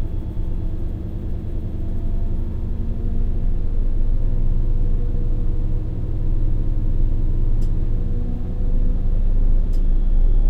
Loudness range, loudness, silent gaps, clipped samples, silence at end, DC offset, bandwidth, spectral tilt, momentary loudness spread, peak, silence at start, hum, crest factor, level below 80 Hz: 3 LU; -26 LUFS; none; under 0.1%; 0 s; under 0.1%; 1.7 kHz; -10 dB/octave; 5 LU; -6 dBFS; 0 s; none; 10 dB; -18 dBFS